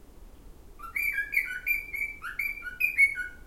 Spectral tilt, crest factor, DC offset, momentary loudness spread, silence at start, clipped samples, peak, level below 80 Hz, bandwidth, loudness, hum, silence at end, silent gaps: -1.5 dB/octave; 18 dB; under 0.1%; 11 LU; 0 s; under 0.1%; -12 dBFS; -50 dBFS; 16 kHz; -27 LUFS; none; 0 s; none